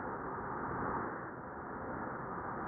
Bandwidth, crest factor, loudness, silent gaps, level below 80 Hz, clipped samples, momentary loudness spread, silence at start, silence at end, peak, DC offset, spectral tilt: 2.5 kHz; 16 dB; -41 LUFS; none; -60 dBFS; under 0.1%; 6 LU; 0 s; 0 s; -26 dBFS; under 0.1%; -2 dB/octave